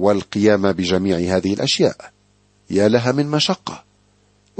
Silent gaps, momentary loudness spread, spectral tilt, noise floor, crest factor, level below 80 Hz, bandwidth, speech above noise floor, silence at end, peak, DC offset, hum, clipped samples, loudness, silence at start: none; 10 LU; -5 dB/octave; -58 dBFS; 18 dB; -54 dBFS; 8.8 kHz; 40 dB; 0.8 s; -2 dBFS; under 0.1%; 50 Hz at -45 dBFS; under 0.1%; -18 LUFS; 0 s